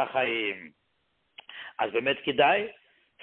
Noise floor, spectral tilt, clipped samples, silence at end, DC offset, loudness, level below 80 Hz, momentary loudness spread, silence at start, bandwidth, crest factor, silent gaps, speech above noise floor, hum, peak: -74 dBFS; -8 dB/octave; under 0.1%; 0.5 s; under 0.1%; -26 LUFS; -72 dBFS; 18 LU; 0 s; 4.4 kHz; 20 dB; none; 47 dB; none; -10 dBFS